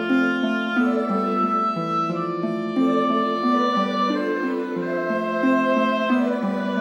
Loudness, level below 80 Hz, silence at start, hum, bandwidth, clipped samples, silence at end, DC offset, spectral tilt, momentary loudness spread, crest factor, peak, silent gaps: -22 LUFS; -74 dBFS; 0 s; none; 8.6 kHz; under 0.1%; 0 s; under 0.1%; -6.5 dB/octave; 5 LU; 14 dB; -8 dBFS; none